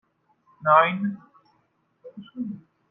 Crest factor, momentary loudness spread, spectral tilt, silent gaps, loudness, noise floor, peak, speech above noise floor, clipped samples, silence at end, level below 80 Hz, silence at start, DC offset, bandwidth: 22 dB; 25 LU; -9 dB/octave; none; -23 LUFS; -69 dBFS; -4 dBFS; 46 dB; under 0.1%; 0.35 s; -76 dBFS; 0.6 s; under 0.1%; 3.9 kHz